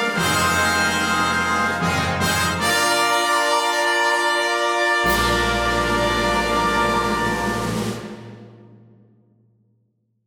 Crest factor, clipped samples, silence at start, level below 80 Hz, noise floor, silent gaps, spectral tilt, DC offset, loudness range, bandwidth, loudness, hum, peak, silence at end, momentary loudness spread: 14 dB; under 0.1%; 0 s; -38 dBFS; -67 dBFS; none; -3 dB/octave; under 0.1%; 6 LU; over 20 kHz; -19 LUFS; none; -6 dBFS; 1.7 s; 5 LU